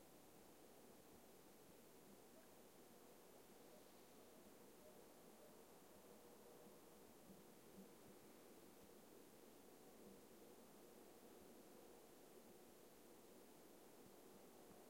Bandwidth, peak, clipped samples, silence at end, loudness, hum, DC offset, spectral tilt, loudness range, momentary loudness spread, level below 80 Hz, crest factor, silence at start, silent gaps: 16.5 kHz; -50 dBFS; under 0.1%; 0 s; -66 LUFS; none; under 0.1%; -4 dB/octave; 1 LU; 2 LU; -88 dBFS; 16 dB; 0 s; none